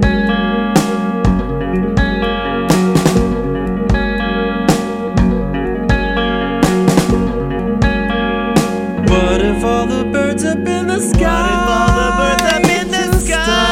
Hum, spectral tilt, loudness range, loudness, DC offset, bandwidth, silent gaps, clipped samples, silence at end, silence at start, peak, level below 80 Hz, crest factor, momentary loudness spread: none; -5.5 dB/octave; 2 LU; -14 LUFS; under 0.1%; 16.5 kHz; none; under 0.1%; 0 s; 0 s; 0 dBFS; -22 dBFS; 14 dB; 5 LU